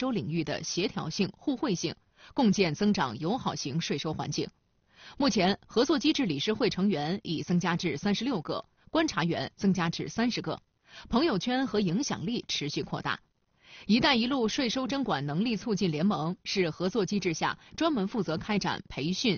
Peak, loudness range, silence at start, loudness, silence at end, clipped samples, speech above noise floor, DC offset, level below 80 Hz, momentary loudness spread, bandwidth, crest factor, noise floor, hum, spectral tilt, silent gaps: -12 dBFS; 2 LU; 0 s; -29 LUFS; 0 s; under 0.1%; 29 dB; under 0.1%; -58 dBFS; 7 LU; 6.8 kHz; 18 dB; -59 dBFS; none; -4.5 dB/octave; none